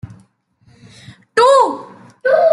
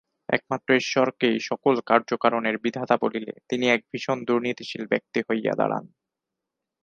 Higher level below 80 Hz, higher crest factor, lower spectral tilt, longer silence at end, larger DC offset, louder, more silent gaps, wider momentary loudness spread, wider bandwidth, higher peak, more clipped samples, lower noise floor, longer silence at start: first, -60 dBFS vs -70 dBFS; second, 14 dB vs 24 dB; second, -3.5 dB/octave vs -5 dB/octave; second, 0 s vs 1 s; neither; first, -14 LUFS vs -24 LUFS; neither; first, 11 LU vs 7 LU; first, 11.5 kHz vs 7.4 kHz; about the same, -2 dBFS vs -2 dBFS; neither; second, -54 dBFS vs -85 dBFS; second, 0.05 s vs 0.3 s